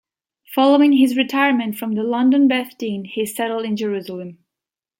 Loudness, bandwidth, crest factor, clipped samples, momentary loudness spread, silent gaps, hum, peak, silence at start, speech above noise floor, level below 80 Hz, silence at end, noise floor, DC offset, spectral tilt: -18 LUFS; 17 kHz; 16 dB; under 0.1%; 13 LU; none; none; -2 dBFS; 0.5 s; 70 dB; -72 dBFS; 0.65 s; -87 dBFS; under 0.1%; -5 dB/octave